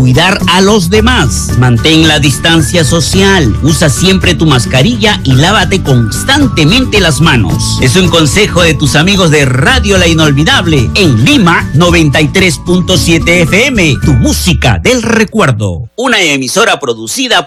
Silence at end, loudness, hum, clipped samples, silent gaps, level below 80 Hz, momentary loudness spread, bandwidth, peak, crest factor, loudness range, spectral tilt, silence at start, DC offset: 0 s; -7 LUFS; none; 2%; none; -22 dBFS; 3 LU; 15.5 kHz; 0 dBFS; 6 dB; 1 LU; -4.5 dB/octave; 0 s; under 0.1%